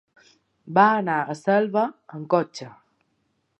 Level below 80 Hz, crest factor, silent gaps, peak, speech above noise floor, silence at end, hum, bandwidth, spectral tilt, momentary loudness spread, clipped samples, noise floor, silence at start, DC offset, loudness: -78 dBFS; 22 dB; none; -4 dBFS; 49 dB; 0.9 s; none; 8.8 kHz; -6.5 dB/octave; 20 LU; under 0.1%; -71 dBFS; 0.65 s; under 0.1%; -22 LUFS